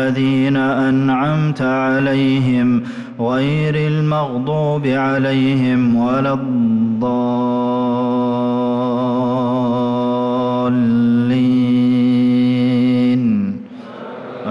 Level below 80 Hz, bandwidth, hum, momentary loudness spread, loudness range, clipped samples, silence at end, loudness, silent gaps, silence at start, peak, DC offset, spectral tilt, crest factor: -52 dBFS; 6.2 kHz; none; 5 LU; 2 LU; under 0.1%; 0 s; -16 LUFS; none; 0 s; -8 dBFS; under 0.1%; -8.5 dB/octave; 8 dB